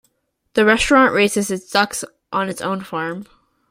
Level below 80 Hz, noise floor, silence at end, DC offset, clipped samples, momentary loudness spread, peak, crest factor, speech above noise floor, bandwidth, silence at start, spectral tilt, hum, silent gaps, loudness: -44 dBFS; -66 dBFS; 0.45 s; under 0.1%; under 0.1%; 13 LU; 0 dBFS; 18 dB; 49 dB; 16 kHz; 0.55 s; -3.5 dB/octave; none; none; -18 LUFS